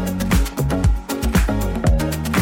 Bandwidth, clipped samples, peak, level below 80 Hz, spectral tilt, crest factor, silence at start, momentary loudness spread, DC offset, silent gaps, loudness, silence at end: 17 kHz; under 0.1%; -6 dBFS; -22 dBFS; -6 dB/octave; 12 dB; 0 s; 2 LU; under 0.1%; none; -20 LUFS; 0 s